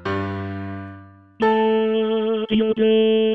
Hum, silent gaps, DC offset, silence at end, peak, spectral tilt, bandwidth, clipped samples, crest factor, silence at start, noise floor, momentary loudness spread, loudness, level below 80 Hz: none; none; under 0.1%; 0 s; -8 dBFS; -8 dB/octave; 5.8 kHz; under 0.1%; 12 dB; 0 s; -42 dBFS; 15 LU; -20 LUFS; -58 dBFS